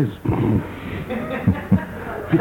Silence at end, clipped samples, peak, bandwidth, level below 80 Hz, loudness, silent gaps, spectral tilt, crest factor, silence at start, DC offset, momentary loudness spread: 0 s; under 0.1%; -4 dBFS; 17 kHz; -38 dBFS; -23 LUFS; none; -9 dB/octave; 18 dB; 0 s; under 0.1%; 10 LU